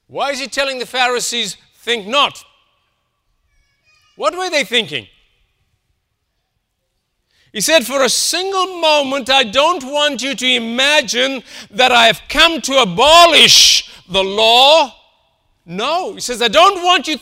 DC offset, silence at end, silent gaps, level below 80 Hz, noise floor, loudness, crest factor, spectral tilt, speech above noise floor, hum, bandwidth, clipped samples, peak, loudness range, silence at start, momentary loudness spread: under 0.1%; 0.05 s; none; -46 dBFS; -70 dBFS; -12 LUFS; 16 dB; -1 dB/octave; 56 dB; none; 16.5 kHz; 0.1%; 0 dBFS; 13 LU; 0.15 s; 13 LU